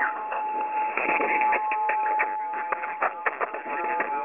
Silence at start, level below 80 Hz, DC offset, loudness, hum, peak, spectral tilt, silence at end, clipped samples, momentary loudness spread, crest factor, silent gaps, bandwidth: 0 s; -74 dBFS; under 0.1%; -26 LUFS; none; -10 dBFS; -1 dB/octave; 0 s; under 0.1%; 7 LU; 16 dB; none; 3.6 kHz